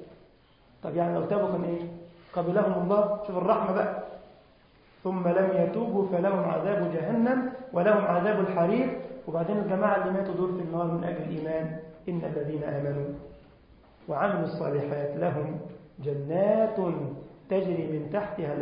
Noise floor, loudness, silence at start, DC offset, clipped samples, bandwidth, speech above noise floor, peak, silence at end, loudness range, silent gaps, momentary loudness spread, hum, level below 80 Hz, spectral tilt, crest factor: -59 dBFS; -28 LUFS; 0 s; under 0.1%; under 0.1%; 5.2 kHz; 32 dB; -10 dBFS; 0 s; 6 LU; none; 12 LU; none; -62 dBFS; -12 dB/octave; 18 dB